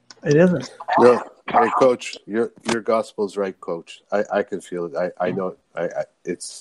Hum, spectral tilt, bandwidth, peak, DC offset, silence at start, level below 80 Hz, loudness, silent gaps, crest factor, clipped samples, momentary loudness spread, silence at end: none; -6 dB/octave; 11.5 kHz; -2 dBFS; under 0.1%; 0.25 s; -64 dBFS; -21 LUFS; none; 20 dB; under 0.1%; 14 LU; 0 s